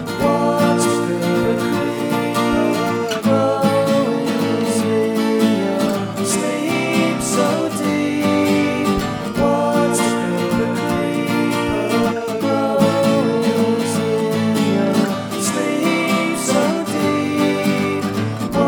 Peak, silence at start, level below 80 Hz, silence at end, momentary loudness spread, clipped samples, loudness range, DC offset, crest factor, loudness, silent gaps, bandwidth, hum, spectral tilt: -4 dBFS; 0 s; -46 dBFS; 0 s; 4 LU; under 0.1%; 1 LU; under 0.1%; 14 dB; -18 LUFS; none; over 20 kHz; none; -5 dB/octave